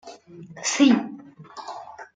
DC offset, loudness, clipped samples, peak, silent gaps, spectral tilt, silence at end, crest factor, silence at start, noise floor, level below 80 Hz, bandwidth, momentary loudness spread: under 0.1%; -21 LUFS; under 0.1%; -6 dBFS; none; -3 dB/octave; 0.1 s; 20 dB; 0.05 s; -42 dBFS; -70 dBFS; 9.6 kHz; 25 LU